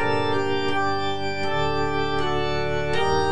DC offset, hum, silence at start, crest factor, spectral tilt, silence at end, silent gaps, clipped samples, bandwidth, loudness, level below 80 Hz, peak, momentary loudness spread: 4%; none; 0 s; 12 dB; -5.5 dB/octave; 0 s; none; under 0.1%; 10 kHz; -24 LUFS; -42 dBFS; -10 dBFS; 3 LU